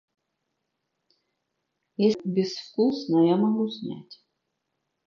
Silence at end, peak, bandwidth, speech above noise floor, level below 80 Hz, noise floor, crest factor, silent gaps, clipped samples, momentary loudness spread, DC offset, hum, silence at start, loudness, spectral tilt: 0.95 s; -10 dBFS; 7.2 kHz; 56 dB; -78 dBFS; -80 dBFS; 18 dB; none; under 0.1%; 15 LU; under 0.1%; none; 2 s; -25 LUFS; -7.5 dB/octave